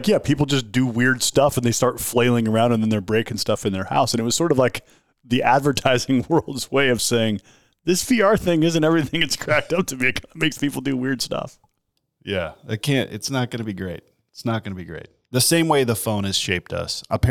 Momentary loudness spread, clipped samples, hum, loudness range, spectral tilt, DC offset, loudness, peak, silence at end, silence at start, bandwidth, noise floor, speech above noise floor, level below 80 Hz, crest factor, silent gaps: 11 LU; under 0.1%; none; 6 LU; -4.5 dB/octave; 0.6%; -21 LUFS; -2 dBFS; 0 s; 0 s; 19.5 kHz; -74 dBFS; 53 dB; -46 dBFS; 18 dB; none